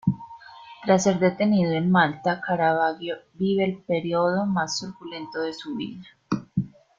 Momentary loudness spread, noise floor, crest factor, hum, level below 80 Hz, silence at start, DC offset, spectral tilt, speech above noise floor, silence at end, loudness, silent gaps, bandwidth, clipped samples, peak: 15 LU; -45 dBFS; 18 dB; none; -60 dBFS; 0.05 s; under 0.1%; -5.5 dB/octave; 21 dB; 0.3 s; -24 LUFS; none; 7.6 kHz; under 0.1%; -6 dBFS